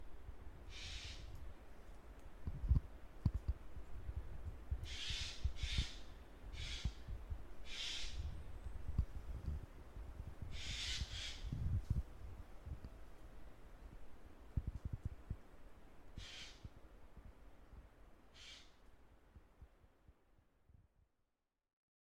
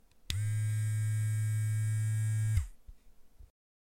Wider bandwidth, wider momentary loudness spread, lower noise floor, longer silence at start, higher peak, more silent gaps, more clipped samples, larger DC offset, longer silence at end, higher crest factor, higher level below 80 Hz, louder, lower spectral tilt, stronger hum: about the same, 14.5 kHz vs 15.5 kHz; first, 20 LU vs 4 LU; first, -88 dBFS vs -55 dBFS; second, 0 s vs 0.3 s; second, -22 dBFS vs -14 dBFS; neither; neither; neither; first, 1.25 s vs 0.55 s; first, 24 dB vs 18 dB; about the same, -50 dBFS vs -50 dBFS; second, -47 LUFS vs -33 LUFS; about the same, -4 dB/octave vs -4.5 dB/octave; neither